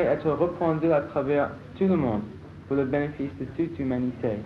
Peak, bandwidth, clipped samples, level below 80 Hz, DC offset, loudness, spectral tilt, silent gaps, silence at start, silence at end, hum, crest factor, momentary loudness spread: -12 dBFS; 6.4 kHz; under 0.1%; -52 dBFS; under 0.1%; -26 LUFS; -10 dB/octave; none; 0 s; 0 s; none; 14 dB; 8 LU